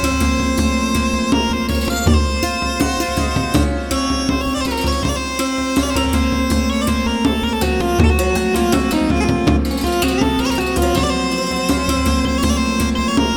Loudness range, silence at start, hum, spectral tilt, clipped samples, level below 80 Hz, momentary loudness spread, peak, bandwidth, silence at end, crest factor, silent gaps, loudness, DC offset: 2 LU; 0 s; none; -5 dB/octave; under 0.1%; -24 dBFS; 3 LU; -2 dBFS; 19.5 kHz; 0 s; 14 dB; none; -17 LUFS; under 0.1%